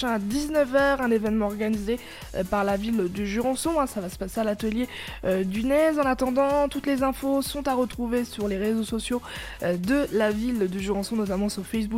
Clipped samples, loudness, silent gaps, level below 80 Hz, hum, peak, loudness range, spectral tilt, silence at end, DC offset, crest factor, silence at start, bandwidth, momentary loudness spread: under 0.1%; -26 LUFS; none; -44 dBFS; none; -10 dBFS; 2 LU; -5.5 dB/octave; 0 s; under 0.1%; 16 dB; 0 s; 16.5 kHz; 8 LU